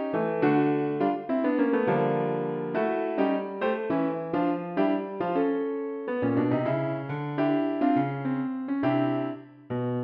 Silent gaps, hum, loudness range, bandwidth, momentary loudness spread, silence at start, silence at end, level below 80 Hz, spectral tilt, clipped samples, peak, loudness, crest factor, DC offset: none; none; 2 LU; 5.2 kHz; 6 LU; 0 s; 0 s; -70 dBFS; -10.5 dB/octave; under 0.1%; -12 dBFS; -27 LUFS; 16 dB; under 0.1%